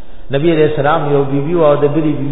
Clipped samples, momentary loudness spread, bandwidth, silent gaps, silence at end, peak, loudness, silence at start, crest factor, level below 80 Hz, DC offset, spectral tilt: under 0.1%; 5 LU; 4.1 kHz; none; 0 s; 0 dBFS; -13 LUFS; 0.1 s; 12 dB; -36 dBFS; 9%; -11.5 dB/octave